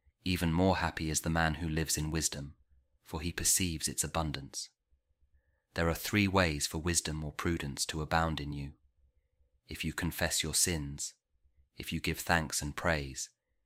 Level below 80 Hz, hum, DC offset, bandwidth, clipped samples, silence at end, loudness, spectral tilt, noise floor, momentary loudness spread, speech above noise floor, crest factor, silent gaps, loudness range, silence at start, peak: -48 dBFS; none; under 0.1%; 16 kHz; under 0.1%; 0.4 s; -32 LUFS; -3.5 dB/octave; -73 dBFS; 13 LU; 40 dB; 22 dB; none; 3 LU; 0.25 s; -12 dBFS